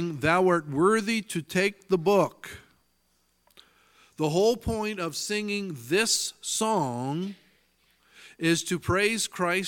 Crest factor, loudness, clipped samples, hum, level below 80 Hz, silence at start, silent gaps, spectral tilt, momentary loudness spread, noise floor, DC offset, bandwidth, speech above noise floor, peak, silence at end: 20 dB; -26 LUFS; under 0.1%; none; -54 dBFS; 0 s; none; -4 dB/octave; 8 LU; -70 dBFS; under 0.1%; 17.5 kHz; 44 dB; -8 dBFS; 0 s